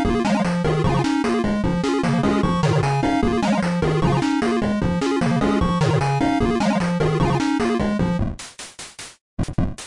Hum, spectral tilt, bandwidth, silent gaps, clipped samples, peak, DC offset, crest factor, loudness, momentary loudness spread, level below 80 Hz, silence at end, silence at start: none; -6.5 dB/octave; 11.5 kHz; 9.21-9.37 s; under 0.1%; -8 dBFS; under 0.1%; 12 dB; -20 LUFS; 9 LU; -34 dBFS; 0 s; 0 s